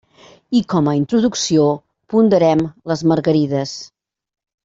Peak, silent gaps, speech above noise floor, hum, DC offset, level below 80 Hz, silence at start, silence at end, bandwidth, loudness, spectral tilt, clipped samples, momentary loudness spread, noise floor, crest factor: -2 dBFS; none; 25 dB; none; under 0.1%; -56 dBFS; 0.5 s; 0.8 s; 7.8 kHz; -17 LUFS; -6 dB/octave; under 0.1%; 9 LU; -40 dBFS; 14 dB